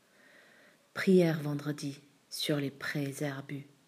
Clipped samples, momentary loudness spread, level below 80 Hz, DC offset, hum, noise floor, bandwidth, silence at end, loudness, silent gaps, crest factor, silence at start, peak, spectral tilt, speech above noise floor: under 0.1%; 17 LU; -84 dBFS; under 0.1%; none; -62 dBFS; 15.5 kHz; 0.25 s; -32 LUFS; none; 20 dB; 0.95 s; -14 dBFS; -6 dB/octave; 31 dB